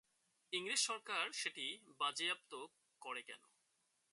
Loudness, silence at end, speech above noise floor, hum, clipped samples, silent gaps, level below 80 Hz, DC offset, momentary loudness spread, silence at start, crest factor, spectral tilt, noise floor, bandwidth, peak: -41 LUFS; 0.75 s; 38 dB; none; under 0.1%; none; under -90 dBFS; under 0.1%; 18 LU; 0.5 s; 20 dB; 0.5 dB/octave; -82 dBFS; 11.5 kHz; -24 dBFS